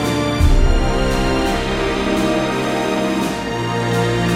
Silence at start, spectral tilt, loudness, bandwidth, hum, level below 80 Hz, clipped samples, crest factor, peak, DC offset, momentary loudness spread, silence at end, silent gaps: 0 s; -5.5 dB/octave; -18 LUFS; 15.5 kHz; none; -22 dBFS; under 0.1%; 14 dB; -2 dBFS; under 0.1%; 4 LU; 0 s; none